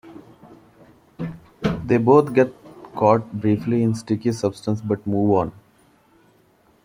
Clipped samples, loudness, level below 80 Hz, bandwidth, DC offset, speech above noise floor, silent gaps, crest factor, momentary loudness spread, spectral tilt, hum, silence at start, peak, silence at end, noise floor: under 0.1%; -20 LUFS; -52 dBFS; 16 kHz; under 0.1%; 39 dB; none; 20 dB; 17 LU; -8 dB/octave; none; 0.05 s; -2 dBFS; 1.35 s; -58 dBFS